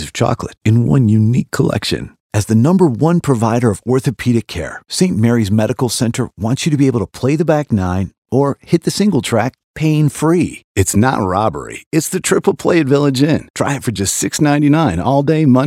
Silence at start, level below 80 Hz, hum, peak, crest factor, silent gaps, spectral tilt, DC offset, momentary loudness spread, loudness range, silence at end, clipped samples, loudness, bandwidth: 0 s; -44 dBFS; none; 0 dBFS; 14 dB; 2.20-2.30 s, 8.18-8.22 s, 9.64-9.74 s, 10.64-10.75 s, 11.86-11.91 s, 13.50-13.54 s; -6 dB/octave; under 0.1%; 7 LU; 2 LU; 0 s; under 0.1%; -15 LUFS; 16 kHz